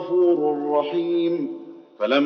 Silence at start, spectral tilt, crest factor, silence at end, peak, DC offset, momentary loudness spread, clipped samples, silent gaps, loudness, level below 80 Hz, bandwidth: 0 s; -3.5 dB/octave; 16 dB; 0 s; -6 dBFS; under 0.1%; 10 LU; under 0.1%; none; -22 LUFS; under -90 dBFS; 5.8 kHz